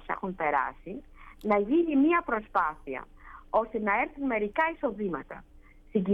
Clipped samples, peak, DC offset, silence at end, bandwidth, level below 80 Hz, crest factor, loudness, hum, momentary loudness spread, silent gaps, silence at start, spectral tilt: under 0.1%; -12 dBFS; under 0.1%; 0 s; 5.2 kHz; -54 dBFS; 16 dB; -28 LUFS; none; 17 LU; none; 0 s; -8.5 dB/octave